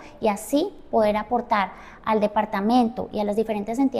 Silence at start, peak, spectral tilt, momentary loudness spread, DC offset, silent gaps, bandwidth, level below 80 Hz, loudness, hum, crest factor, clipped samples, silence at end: 0 s; -8 dBFS; -5.5 dB/octave; 5 LU; under 0.1%; none; 15.5 kHz; -52 dBFS; -24 LUFS; none; 16 dB; under 0.1%; 0 s